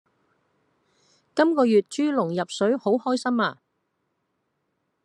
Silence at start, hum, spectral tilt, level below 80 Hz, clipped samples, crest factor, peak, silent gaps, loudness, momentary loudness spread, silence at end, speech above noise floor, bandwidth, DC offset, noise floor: 1.35 s; none; -5.5 dB/octave; -78 dBFS; under 0.1%; 20 dB; -6 dBFS; none; -23 LUFS; 6 LU; 1.5 s; 53 dB; 11 kHz; under 0.1%; -75 dBFS